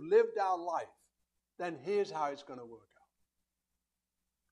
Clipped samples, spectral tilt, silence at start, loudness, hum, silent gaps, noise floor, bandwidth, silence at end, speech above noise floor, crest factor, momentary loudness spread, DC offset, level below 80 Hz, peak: under 0.1%; -5 dB/octave; 0 s; -35 LUFS; none; none; -88 dBFS; 10 kHz; 1.75 s; 54 dB; 20 dB; 20 LU; under 0.1%; -86 dBFS; -16 dBFS